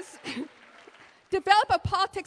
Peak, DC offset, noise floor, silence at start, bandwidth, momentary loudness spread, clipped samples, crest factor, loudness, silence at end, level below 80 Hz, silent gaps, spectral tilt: -6 dBFS; under 0.1%; -54 dBFS; 0 s; 11 kHz; 16 LU; under 0.1%; 22 dB; -25 LUFS; 0.05 s; -52 dBFS; none; -4 dB/octave